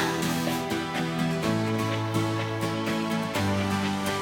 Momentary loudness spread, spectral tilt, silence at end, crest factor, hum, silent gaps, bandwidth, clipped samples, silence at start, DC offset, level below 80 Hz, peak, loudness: 2 LU; -5 dB/octave; 0 s; 14 dB; none; none; 18 kHz; under 0.1%; 0 s; under 0.1%; -58 dBFS; -12 dBFS; -27 LUFS